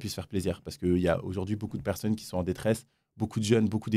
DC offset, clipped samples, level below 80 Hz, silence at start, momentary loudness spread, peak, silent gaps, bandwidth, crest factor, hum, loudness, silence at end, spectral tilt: under 0.1%; under 0.1%; -58 dBFS; 0 s; 8 LU; -10 dBFS; none; 15.5 kHz; 20 dB; none; -30 LUFS; 0 s; -6.5 dB/octave